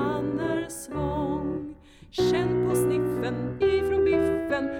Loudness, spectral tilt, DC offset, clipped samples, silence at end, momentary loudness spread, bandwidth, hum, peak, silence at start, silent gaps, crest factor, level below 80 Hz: -26 LUFS; -6 dB/octave; under 0.1%; under 0.1%; 0 s; 9 LU; 16.5 kHz; none; -12 dBFS; 0 s; none; 12 dB; -46 dBFS